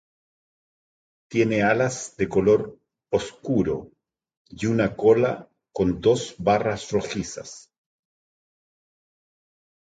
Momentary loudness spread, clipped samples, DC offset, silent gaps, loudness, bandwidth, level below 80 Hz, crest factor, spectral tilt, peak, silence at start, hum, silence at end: 13 LU; under 0.1%; under 0.1%; 4.37-4.45 s; -23 LUFS; 9.2 kHz; -52 dBFS; 20 dB; -5.5 dB/octave; -6 dBFS; 1.3 s; none; 2.4 s